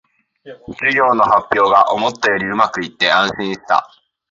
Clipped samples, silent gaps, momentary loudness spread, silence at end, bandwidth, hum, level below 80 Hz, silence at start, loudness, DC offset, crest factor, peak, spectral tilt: under 0.1%; none; 7 LU; 0.45 s; 7.8 kHz; none; -54 dBFS; 0.45 s; -15 LUFS; under 0.1%; 16 dB; 0 dBFS; -4 dB/octave